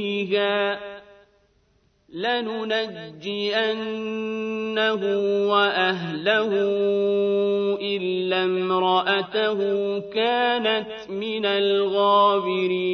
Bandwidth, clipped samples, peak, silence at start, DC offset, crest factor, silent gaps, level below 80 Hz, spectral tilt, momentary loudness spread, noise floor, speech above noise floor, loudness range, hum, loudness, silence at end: 6.4 kHz; under 0.1%; -6 dBFS; 0 s; under 0.1%; 16 dB; none; -68 dBFS; -6 dB/octave; 9 LU; -64 dBFS; 41 dB; 5 LU; none; -23 LUFS; 0 s